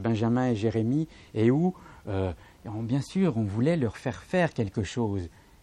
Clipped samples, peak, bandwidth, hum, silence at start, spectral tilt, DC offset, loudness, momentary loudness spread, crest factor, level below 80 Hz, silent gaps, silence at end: under 0.1%; -10 dBFS; 11.5 kHz; none; 0 s; -7.5 dB/octave; under 0.1%; -28 LUFS; 10 LU; 16 dB; -54 dBFS; none; 0.35 s